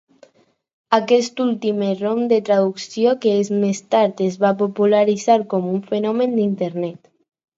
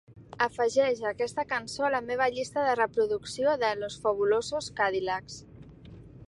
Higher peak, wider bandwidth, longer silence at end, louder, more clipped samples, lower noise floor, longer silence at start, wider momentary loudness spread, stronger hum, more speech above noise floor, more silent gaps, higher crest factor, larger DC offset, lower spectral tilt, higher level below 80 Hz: first, 0 dBFS vs -10 dBFS; second, 8 kHz vs 11.5 kHz; first, 0.6 s vs 0.05 s; first, -19 LUFS vs -28 LUFS; neither; first, -59 dBFS vs -49 dBFS; first, 0.9 s vs 0.1 s; about the same, 6 LU vs 6 LU; neither; first, 41 dB vs 20 dB; neither; about the same, 18 dB vs 18 dB; neither; first, -6 dB/octave vs -3.5 dB/octave; second, -70 dBFS vs -60 dBFS